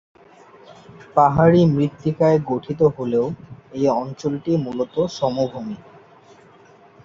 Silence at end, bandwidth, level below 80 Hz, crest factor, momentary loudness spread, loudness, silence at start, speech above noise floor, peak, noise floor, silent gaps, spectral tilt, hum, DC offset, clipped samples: 1.3 s; 7.4 kHz; -52 dBFS; 20 dB; 13 LU; -19 LUFS; 0.7 s; 30 dB; 0 dBFS; -49 dBFS; none; -8 dB/octave; none; under 0.1%; under 0.1%